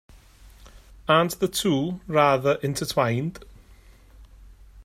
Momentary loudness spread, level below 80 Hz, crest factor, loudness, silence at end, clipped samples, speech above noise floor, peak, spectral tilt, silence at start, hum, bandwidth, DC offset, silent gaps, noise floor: 8 LU; -50 dBFS; 20 dB; -23 LUFS; 0 s; under 0.1%; 28 dB; -6 dBFS; -5 dB/octave; 0.65 s; none; 16 kHz; under 0.1%; none; -51 dBFS